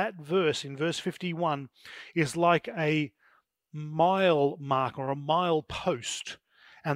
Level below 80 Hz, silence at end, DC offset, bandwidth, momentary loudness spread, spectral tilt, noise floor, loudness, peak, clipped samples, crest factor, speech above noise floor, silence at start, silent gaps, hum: -64 dBFS; 0 s; under 0.1%; 15.5 kHz; 14 LU; -5 dB/octave; -67 dBFS; -28 LUFS; -10 dBFS; under 0.1%; 20 dB; 38 dB; 0 s; none; none